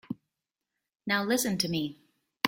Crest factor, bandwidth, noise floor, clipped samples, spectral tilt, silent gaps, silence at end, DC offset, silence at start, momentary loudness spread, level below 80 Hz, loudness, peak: 26 dB; 16.5 kHz; -87 dBFS; under 0.1%; -3.5 dB/octave; none; 0 s; under 0.1%; 0.1 s; 16 LU; -70 dBFS; -29 LUFS; -6 dBFS